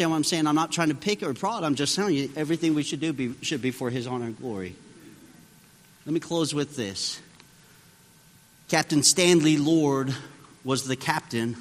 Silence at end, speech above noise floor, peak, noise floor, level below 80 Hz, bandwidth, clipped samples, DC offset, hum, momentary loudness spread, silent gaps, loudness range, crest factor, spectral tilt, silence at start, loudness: 0 s; 30 dB; -4 dBFS; -55 dBFS; -66 dBFS; 15.5 kHz; under 0.1%; under 0.1%; none; 13 LU; none; 9 LU; 22 dB; -4 dB/octave; 0 s; -25 LUFS